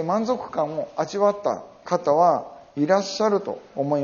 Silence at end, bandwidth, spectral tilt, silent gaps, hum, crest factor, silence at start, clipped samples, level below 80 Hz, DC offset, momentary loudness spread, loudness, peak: 0 s; 7.2 kHz; -5 dB/octave; none; none; 18 dB; 0 s; under 0.1%; -66 dBFS; under 0.1%; 9 LU; -23 LUFS; -6 dBFS